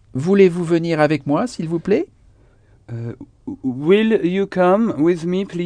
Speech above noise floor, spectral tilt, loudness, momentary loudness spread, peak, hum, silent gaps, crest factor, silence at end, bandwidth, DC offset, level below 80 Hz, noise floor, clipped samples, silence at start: 34 dB; -7.5 dB/octave; -17 LUFS; 17 LU; -2 dBFS; none; none; 16 dB; 0 s; 10 kHz; under 0.1%; -54 dBFS; -51 dBFS; under 0.1%; 0.15 s